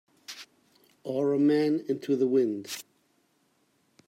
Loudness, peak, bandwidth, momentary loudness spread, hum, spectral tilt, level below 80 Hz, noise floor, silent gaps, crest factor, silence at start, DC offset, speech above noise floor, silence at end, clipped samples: -27 LUFS; -14 dBFS; 16 kHz; 20 LU; none; -6 dB/octave; -82 dBFS; -70 dBFS; none; 16 dB; 0.3 s; under 0.1%; 44 dB; 1.25 s; under 0.1%